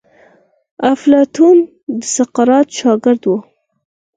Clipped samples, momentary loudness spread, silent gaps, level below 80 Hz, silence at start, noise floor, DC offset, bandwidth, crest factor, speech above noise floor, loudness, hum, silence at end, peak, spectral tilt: under 0.1%; 9 LU; 1.83-1.87 s; -62 dBFS; 0.8 s; -50 dBFS; under 0.1%; 9.6 kHz; 14 dB; 39 dB; -13 LUFS; none; 0.75 s; 0 dBFS; -4.5 dB/octave